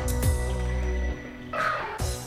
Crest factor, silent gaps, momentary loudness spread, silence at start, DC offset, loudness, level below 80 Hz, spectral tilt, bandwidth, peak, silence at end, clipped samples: 14 dB; none; 7 LU; 0 s; under 0.1%; -29 LUFS; -30 dBFS; -5 dB/octave; 16 kHz; -12 dBFS; 0 s; under 0.1%